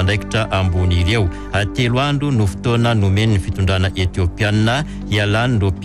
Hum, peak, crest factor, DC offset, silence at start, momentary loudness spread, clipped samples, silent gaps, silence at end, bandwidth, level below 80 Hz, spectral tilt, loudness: none; -6 dBFS; 10 dB; under 0.1%; 0 s; 4 LU; under 0.1%; none; 0 s; 11.5 kHz; -30 dBFS; -6 dB/octave; -17 LUFS